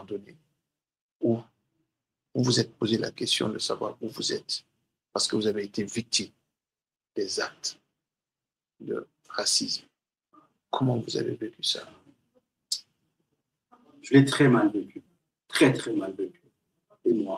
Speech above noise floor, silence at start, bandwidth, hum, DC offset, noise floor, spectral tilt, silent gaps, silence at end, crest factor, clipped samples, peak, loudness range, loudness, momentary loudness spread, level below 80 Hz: over 63 dB; 0 s; 15.5 kHz; none; under 0.1%; under -90 dBFS; -4.5 dB/octave; 1.01-1.20 s; 0 s; 24 dB; under 0.1%; -6 dBFS; 7 LU; -27 LUFS; 14 LU; -72 dBFS